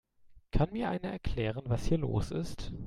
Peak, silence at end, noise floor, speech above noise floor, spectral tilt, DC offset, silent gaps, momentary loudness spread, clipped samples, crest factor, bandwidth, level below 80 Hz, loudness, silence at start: -16 dBFS; 0 s; -59 dBFS; 26 dB; -7 dB/octave; under 0.1%; none; 6 LU; under 0.1%; 18 dB; 12.5 kHz; -40 dBFS; -34 LUFS; 0.25 s